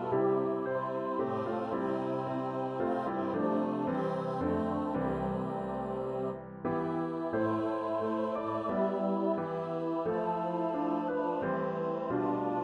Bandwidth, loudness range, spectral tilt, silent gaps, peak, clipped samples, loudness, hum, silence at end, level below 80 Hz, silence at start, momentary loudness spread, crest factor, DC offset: 9.8 kHz; 1 LU; -9 dB/octave; none; -18 dBFS; under 0.1%; -33 LUFS; none; 0 s; -62 dBFS; 0 s; 4 LU; 14 dB; under 0.1%